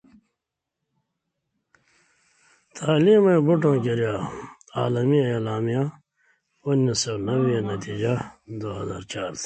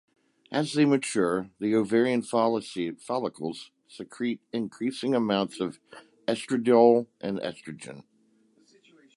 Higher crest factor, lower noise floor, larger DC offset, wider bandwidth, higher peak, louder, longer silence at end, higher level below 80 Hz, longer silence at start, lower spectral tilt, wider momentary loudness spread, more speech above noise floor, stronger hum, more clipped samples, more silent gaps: about the same, 18 dB vs 20 dB; first, -84 dBFS vs -65 dBFS; neither; second, 9.2 kHz vs 11.5 kHz; about the same, -8 dBFS vs -6 dBFS; first, -23 LUFS vs -27 LUFS; second, 0 s vs 1.15 s; first, -58 dBFS vs -70 dBFS; first, 2.75 s vs 0.5 s; about the same, -6 dB/octave vs -5.5 dB/octave; about the same, 15 LU vs 17 LU; first, 62 dB vs 38 dB; neither; neither; neither